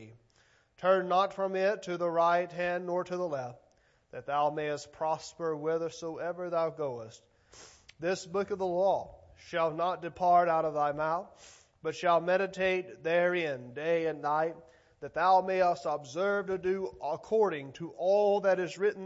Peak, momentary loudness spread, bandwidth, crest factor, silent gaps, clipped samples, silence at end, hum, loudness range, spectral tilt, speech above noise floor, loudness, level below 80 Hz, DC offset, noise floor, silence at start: -14 dBFS; 11 LU; 8 kHz; 18 dB; none; under 0.1%; 0 s; none; 5 LU; -5.5 dB/octave; 37 dB; -31 LUFS; -70 dBFS; under 0.1%; -67 dBFS; 0 s